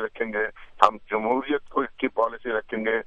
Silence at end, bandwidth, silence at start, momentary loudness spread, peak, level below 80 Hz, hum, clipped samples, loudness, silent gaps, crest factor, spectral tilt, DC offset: 0 s; 10.5 kHz; 0 s; 7 LU; 0 dBFS; -56 dBFS; none; under 0.1%; -25 LUFS; none; 26 dB; -5 dB/octave; under 0.1%